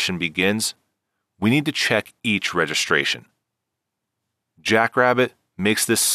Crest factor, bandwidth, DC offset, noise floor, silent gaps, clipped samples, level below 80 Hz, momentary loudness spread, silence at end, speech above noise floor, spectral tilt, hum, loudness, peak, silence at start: 20 dB; 14.5 kHz; under 0.1%; -81 dBFS; none; under 0.1%; -62 dBFS; 7 LU; 0 s; 60 dB; -3 dB/octave; none; -20 LUFS; -4 dBFS; 0 s